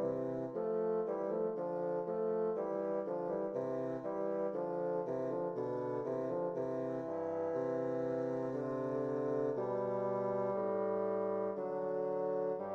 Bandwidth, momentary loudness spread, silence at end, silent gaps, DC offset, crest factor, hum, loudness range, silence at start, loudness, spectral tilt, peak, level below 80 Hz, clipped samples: 6.6 kHz; 3 LU; 0 s; none; under 0.1%; 12 dB; none; 2 LU; 0 s; -37 LUFS; -9.5 dB/octave; -24 dBFS; -78 dBFS; under 0.1%